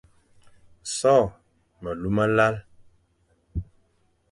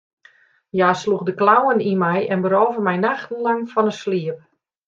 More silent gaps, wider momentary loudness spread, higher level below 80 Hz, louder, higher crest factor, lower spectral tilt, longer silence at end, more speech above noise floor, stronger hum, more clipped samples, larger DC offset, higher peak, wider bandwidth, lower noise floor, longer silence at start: neither; first, 17 LU vs 8 LU; first, -46 dBFS vs -66 dBFS; second, -24 LUFS vs -19 LUFS; about the same, 20 dB vs 18 dB; second, -5 dB/octave vs -6.5 dB/octave; first, 0.7 s vs 0.5 s; first, 45 dB vs 35 dB; neither; neither; neither; second, -6 dBFS vs -2 dBFS; first, 11.5 kHz vs 7.6 kHz; first, -66 dBFS vs -54 dBFS; about the same, 0.85 s vs 0.75 s